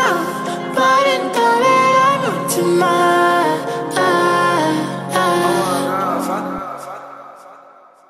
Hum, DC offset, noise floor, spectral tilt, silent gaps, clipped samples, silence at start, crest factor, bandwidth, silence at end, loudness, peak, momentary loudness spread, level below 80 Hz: none; under 0.1%; -45 dBFS; -4 dB/octave; none; under 0.1%; 0 s; 14 dB; 15.5 kHz; 0.55 s; -15 LUFS; -2 dBFS; 12 LU; -60 dBFS